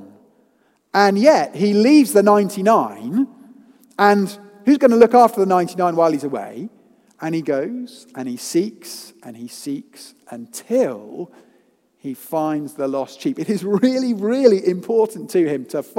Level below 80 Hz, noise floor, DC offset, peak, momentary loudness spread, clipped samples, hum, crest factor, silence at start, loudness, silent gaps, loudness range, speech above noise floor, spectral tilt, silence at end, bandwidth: -70 dBFS; -61 dBFS; under 0.1%; 0 dBFS; 21 LU; under 0.1%; none; 18 dB; 0 s; -17 LUFS; none; 11 LU; 43 dB; -5.5 dB/octave; 0.15 s; 16.5 kHz